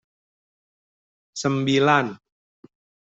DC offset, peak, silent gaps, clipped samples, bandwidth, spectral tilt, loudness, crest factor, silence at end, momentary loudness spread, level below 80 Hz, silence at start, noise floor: under 0.1%; -4 dBFS; none; under 0.1%; 8.2 kHz; -5 dB/octave; -21 LUFS; 22 dB; 0.95 s; 14 LU; -66 dBFS; 1.35 s; under -90 dBFS